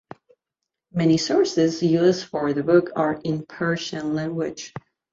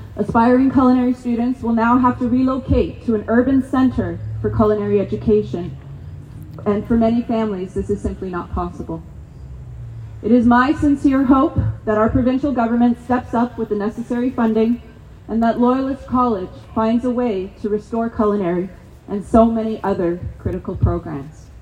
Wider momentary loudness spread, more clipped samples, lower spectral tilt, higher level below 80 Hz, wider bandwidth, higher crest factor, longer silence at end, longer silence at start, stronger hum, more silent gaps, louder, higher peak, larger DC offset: second, 11 LU vs 16 LU; neither; second, -6 dB/octave vs -8.5 dB/octave; second, -62 dBFS vs -34 dBFS; second, 7.8 kHz vs 9.4 kHz; about the same, 18 dB vs 18 dB; first, 0.35 s vs 0 s; first, 0.95 s vs 0 s; neither; neither; second, -22 LUFS vs -18 LUFS; second, -6 dBFS vs 0 dBFS; neither